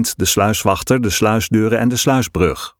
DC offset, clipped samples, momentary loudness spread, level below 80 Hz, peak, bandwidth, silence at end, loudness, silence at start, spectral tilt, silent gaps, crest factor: under 0.1%; under 0.1%; 2 LU; -38 dBFS; 0 dBFS; 19 kHz; 0.1 s; -15 LUFS; 0 s; -4.5 dB/octave; none; 16 dB